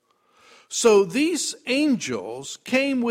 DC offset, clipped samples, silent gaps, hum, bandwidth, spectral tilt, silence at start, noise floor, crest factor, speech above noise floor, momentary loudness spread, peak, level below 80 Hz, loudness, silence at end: under 0.1%; under 0.1%; none; none; 16 kHz; -3 dB/octave; 0.7 s; -58 dBFS; 16 dB; 36 dB; 13 LU; -6 dBFS; -66 dBFS; -22 LUFS; 0 s